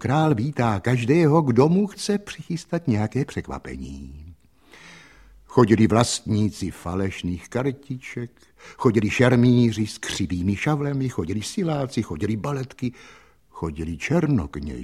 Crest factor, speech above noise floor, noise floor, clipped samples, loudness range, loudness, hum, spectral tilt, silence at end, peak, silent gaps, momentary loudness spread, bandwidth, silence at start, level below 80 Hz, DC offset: 22 dB; 29 dB; -52 dBFS; under 0.1%; 6 LU; -23 LUFS; none; -6.5 dB/octave; 0 s; -2 dBFS; none; 15 LU; 13.5 kHz; 0 s; -46 dBFS; under 0.1%